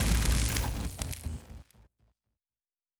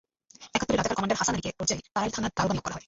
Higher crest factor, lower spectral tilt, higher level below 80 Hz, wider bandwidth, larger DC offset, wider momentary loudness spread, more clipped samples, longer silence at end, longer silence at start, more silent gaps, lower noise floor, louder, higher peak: about the same, 20 dB vs 20 dB; about the same, -4 dB/octave vs -3.5 dB/octave; first, -36 dBFS vs -50 dBFS; first, over 20 kHz vs 8 kHz; neither; first, 20 LU vs 4 LU; neither; first, 1.35 s vs 0.1 s; second, 0 s vs 0.4 s; neither; first, under -90 dBFS vs -53 dBFS; second, -32 LUFS vs -28 LUFS; second, -14 dBFS vs -10 dBFS